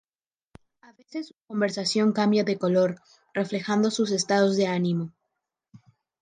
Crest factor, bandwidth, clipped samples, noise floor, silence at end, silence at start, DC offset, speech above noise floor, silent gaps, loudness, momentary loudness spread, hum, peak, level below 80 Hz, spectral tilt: 16 dB; 9.6 kHz; under 0.1%; under -90 dBFS; 0.45 s; 1.15 s; under 0.1%; over 65 dB; none; -25 LUFS; 15 LU; none; -10 dBFS; -72 dBFS; -5 dB/octave